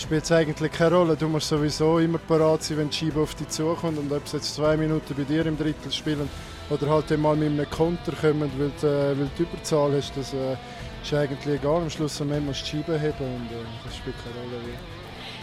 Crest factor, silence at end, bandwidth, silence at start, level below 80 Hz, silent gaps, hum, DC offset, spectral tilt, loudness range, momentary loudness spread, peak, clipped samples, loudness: 16 dB; 0 s; 13.5 kHz; 0 s; -46 dBFS; none; none; under 0.1%; -6 dB/octave; 5 LU; 13 LU; -10 dBFS; under 0.1%; -25 LUFS